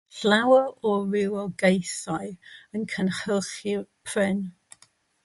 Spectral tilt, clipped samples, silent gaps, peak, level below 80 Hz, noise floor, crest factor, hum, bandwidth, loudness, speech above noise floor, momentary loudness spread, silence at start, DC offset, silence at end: -5 dB/octave; under 0.1%; none; -6 dBFS; -66 dBFS; -61 dBFS; 20 dB; none; 11.5 kHz; -25 LUFS; 37 dB; 13 LU; 0.15 s; under 0.1%; 0.75 s